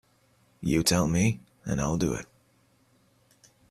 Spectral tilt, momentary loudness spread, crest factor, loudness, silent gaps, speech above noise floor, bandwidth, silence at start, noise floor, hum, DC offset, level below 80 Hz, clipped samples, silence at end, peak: -5 dB/octave; 13 LU; 22 dB; -27 LUFS; none; 40 dB; 15 kHz; 0.6 s; -65 dBFS; none; under 0.1%; -48 dBFS; under 0.1%; 1.45 s; -8 dBFS